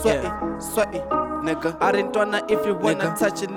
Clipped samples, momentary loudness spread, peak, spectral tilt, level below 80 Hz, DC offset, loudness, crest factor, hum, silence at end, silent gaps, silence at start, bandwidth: under 0.1%; 4 LU; -8 dBFS; -4.5 dB/octave; -44 dBFS; under 0.1%; -23 LUFS; 16 dB; none; 0 s; none; 0 s; 19.5 kHz